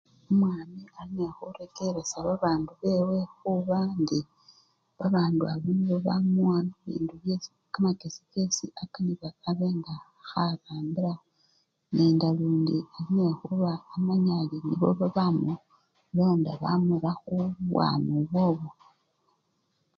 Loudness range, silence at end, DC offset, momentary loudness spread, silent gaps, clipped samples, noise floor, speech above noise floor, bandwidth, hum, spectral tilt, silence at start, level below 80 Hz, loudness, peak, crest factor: 4 LU; 1.25 s; under 0.1%; 10 LU; none; under 0.1%; -74 dBFS; 47 dB; 7.4 kHz; none; -7 dB/octave; 0.3 s; -64 dBFS; -28 LUFS; -12 dBFS; 16 dB